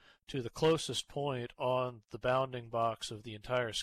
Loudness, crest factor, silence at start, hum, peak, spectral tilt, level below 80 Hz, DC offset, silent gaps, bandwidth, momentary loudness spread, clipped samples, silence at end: -35 LUFS; 14 dB; 0.3 s; none; -22 dBFS; -4.5 dB/octave; -62 dBFS; under 0.1%; none; 14 kHz; 10 LU; under 0.1%; 0 s